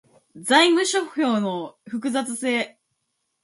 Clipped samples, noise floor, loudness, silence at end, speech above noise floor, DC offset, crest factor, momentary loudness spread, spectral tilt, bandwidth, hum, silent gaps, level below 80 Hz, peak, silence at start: under 0.1%; -75 dBFS; -21 LUFS; 0.75 s; 54 dB; under 0.1%; 20 dB; 16 LU; -3 dB/octave; 11.5 kHz; none; none; -74 dBFS; -4 dBFS; 0.35 s